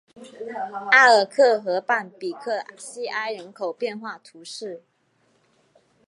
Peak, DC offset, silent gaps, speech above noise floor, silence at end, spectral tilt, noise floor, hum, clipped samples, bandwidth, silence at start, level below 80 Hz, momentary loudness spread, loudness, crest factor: -2 dBFS; under 0.1%; none; 43 dB; 1.3 s; -2.5 dB/octave; -66 dBFS; none; under 0.1%; 11.5 kHz; 0.15 s; -84 dBFS; 22 LU; -21 LUFS; 22 dB